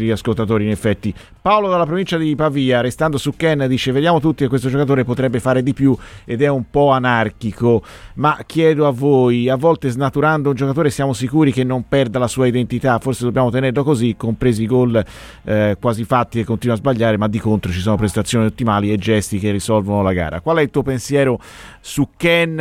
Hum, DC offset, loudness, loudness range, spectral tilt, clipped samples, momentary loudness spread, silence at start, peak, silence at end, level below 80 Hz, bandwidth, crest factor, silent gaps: none; under 0.1%; -17 LUFS; 2 LU; -6.5 dB/octave; under 0.1%; 5 LU; 0 s; -2 dBFS; 0 s; -42 dBFS; 15.5 kHz; 14 dB; none